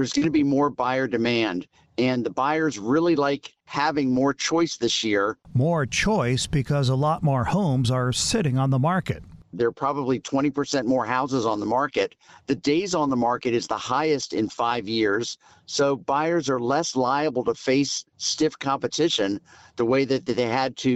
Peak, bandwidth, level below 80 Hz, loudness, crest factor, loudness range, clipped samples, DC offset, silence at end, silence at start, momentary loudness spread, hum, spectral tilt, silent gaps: -8 dBFS; 12 kHz; -50 dBFS; -24 LUFS; 14 dB; 2 LU; under 0.1%; under 0.1%; 0 s; 0 s; 5 LU; none; -5 dB/octave; none